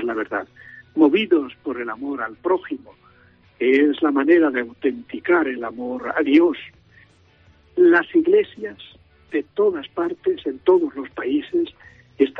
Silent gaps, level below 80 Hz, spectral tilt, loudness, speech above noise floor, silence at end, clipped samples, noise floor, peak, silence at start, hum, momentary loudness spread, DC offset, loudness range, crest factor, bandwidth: none; -62 dBFS; -7 dB/octave; -20 LUFS; 34 dB; 0 s; under 0.1%; -54 dBFS; -2 dBFS; 0 s; none; 13 LU; under 0.1%; 3 LU; 18 dB; 4.9 kHz